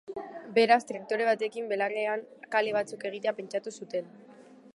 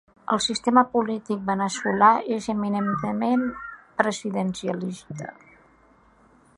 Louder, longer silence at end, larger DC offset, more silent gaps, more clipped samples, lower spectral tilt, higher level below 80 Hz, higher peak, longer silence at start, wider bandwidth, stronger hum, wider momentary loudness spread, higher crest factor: second, -29 LUFS vs -24 LUFS; second, 0.05 s vs 1.25 s; neither; neither; neither; about the same, -4 dB/octave vs -5 dB/octave; second, -82 dBFS vs -60 dBFS; second, -10 dBFS vs -4 dBFS; second, 0.1 s vs 0.3 s; about the same, 11.5 kHz vs 11.5 kHz; neither; about the same, 13 LU vs 15 LU; about the same, 20 dB vs 20 dB